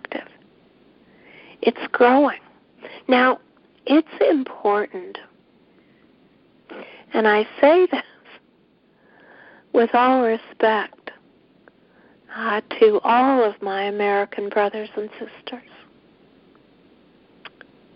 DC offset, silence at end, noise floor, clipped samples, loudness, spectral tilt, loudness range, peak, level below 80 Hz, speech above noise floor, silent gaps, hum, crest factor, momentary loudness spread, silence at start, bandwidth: under 0.1%; 2.35 s; -58 dBFS; under 0.1%; -19 LUFS; -9 dB/octave; 6 LU; -2 dBFS; -68 dBFS; 40 dB; none; none; 20 dB; 21 LU; 0.1 s; 5.4 kHz